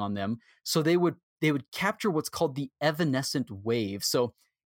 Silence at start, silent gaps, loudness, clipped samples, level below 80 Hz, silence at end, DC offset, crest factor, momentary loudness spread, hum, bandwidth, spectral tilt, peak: 0 s; 1.23-1.36 s, 1.68-1.72 s; -29 LUFS; under 0.1%; -70 dBFS; 0.35 s; under 0.1%; 18 dB; 7 LU; none; 17 kHz; -5 dB/octave; -10 dBFS